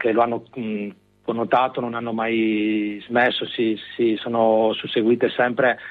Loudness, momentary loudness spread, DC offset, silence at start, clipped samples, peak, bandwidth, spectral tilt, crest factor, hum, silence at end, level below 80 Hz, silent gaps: -21 LUFS; 9 LU; under 0.1%; 0 s; under 0.1%; -6 dBFS; 4.7 kHz; -8 dB/octave; 16 dB; none; 0 s; -66 dBFS; none